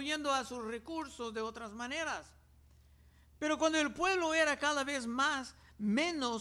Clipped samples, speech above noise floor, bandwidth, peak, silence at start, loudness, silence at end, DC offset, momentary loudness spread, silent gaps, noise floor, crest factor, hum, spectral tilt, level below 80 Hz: under 0.1%; 28 dB; 14 kHz; -18 dBFS; 0 s; -35 LUFS; 0 s; under 0.1%; 11 LU; none; -63 dBFS; 18 dB; none; -3 dB/octave; -64 dBFS